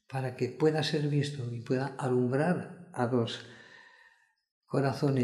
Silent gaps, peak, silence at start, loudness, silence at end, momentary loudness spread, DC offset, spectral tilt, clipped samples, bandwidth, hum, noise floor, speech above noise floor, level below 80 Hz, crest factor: 4.51-4.61 s; -14 dBFS; 0.1 s; -31 LUFS; 0 s; 10 LU; under 0.1%; -7 dB/octave; under 0.1%; 12 kHz; none; -65 dBFS; 35 dB; -74 dBFS; 18 dB